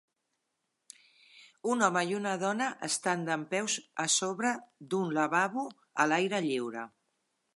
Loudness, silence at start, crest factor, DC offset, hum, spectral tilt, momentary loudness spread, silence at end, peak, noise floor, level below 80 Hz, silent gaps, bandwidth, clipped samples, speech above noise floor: -31 LUFS; 1.35 s; 22 dB; under 0.1%; none; -3 dB/octave; 10 LU; 0.7 s; -12 dBFS; -82 dBFS; -86 dBFS; none; 11.5 kHz; under 0.1%; 51 dB